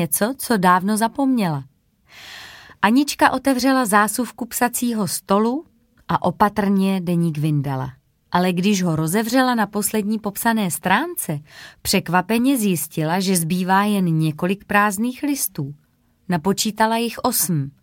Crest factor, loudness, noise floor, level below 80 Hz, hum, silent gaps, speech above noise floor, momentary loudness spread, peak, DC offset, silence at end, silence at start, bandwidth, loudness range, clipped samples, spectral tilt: 18 dB; -19 LUFS; -50 dBFS; -54 dBFS; none; none; 31 dB; 8 LU; -2 dBFS; under 0.1%; 0.15 s; 0 s; 17 kHz; 2 LU; under 0.1%; -4.5 dB/octave